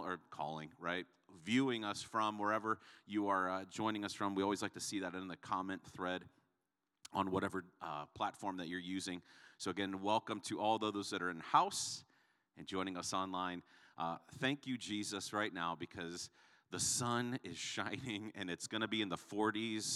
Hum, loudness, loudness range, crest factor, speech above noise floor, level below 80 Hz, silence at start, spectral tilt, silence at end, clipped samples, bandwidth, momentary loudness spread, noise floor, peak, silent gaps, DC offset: none; -40 LUFS; 4 LU; 24 dB; 48 dB; -82 dBFS; 0 s; -3.5 dB/octave; 0 s; under 0.1%; 14.5 kHz; 10 LU; -88 dBFS; -18 dBFS; none; under 0.1%